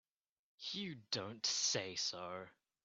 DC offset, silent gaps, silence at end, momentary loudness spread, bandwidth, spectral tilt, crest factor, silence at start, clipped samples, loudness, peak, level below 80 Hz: under 0.1%; none; 0.35 s; 14 LU; 8.6 kHz; -1.5 dB/octave; 20 dB; 0.6 s; under 0.1%; -40 LUFS; -24 dBFS; -84 dBFS